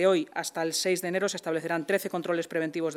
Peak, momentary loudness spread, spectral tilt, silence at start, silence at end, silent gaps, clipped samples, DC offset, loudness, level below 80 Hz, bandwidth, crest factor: -12 dBFS; 4 LU; -3.5 dB/octave; 0 s; 0 s; none; under 0.1%; under 0.1%; -29 LUFS; -88 dBFS; 18 kHz; 16 dB